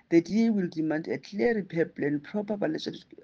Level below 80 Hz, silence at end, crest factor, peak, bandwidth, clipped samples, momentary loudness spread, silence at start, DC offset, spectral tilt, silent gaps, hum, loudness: -66 dBFS; 0.2 s; 18 dB; -10 dBFS; 7.2 kHz; under 0.1%; 8 LU; 0.1 s; under 0.1%; -7 dB/octave; none; none; -29 LUFS